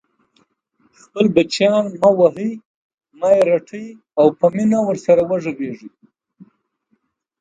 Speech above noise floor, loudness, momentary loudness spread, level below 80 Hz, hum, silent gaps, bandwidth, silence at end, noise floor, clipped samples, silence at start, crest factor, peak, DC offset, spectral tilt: 51 dB; -17 LUFS; 16 LU; -60 dBFS; none; 2.65-2.98 s; 9.4 kHz; 1.55 s; -67 dBFS; under 0.1%; 1.15 s; 18 dB; 0 dBFS; under 0.1%; -6 dB/octave